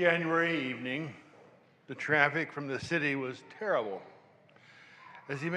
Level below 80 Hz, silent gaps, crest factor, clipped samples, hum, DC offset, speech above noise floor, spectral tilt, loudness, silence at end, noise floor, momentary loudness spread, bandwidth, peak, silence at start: -76 dBFS; none; 24 dB; under 0.1%; none; under 0.1%; 29 dB; -6 dB/octave; -32 LUFS; 0 s; -60 dBFS; 18 LU; 11 kHz; -8 dBFS; 0 s